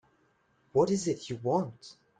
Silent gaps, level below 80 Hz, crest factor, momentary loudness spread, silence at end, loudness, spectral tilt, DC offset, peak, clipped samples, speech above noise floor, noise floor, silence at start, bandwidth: none; -68 dBFS; 20 dB; 11 LU; 0.25 s; -30 LUFS; -6 dB/octave; under 0.1%; -12 dBFS; under 0.1%; 40 dB; -70 dBFS; 0.75 s; 9.4 kHz